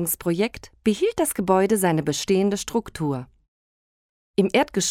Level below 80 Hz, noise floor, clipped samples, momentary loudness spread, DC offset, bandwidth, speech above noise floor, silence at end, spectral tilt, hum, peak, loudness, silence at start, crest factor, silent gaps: -52 dBFS; under -90 dBFS; under 0.1%; 8 LU; under 0.1%; 17.5 kHz; over 68 dB; 0 s; -4.5 dB/octave; none; -6 dBFS; -23 LUFS; 0 s; 18 dB; 3.48-4.34 s